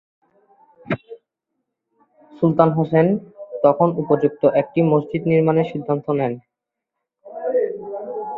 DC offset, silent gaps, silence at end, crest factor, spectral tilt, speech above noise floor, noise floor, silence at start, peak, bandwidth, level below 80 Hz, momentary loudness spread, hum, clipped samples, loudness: under 0.1%; none; 0 s; 18 dB; -11 dB/octave; 65 dB; -82 dBFS; 0.85 s; -2 dBFS; 4.6 kHz; -60 dBFS; 13 LU; none; under 0.1%; -19 LUFS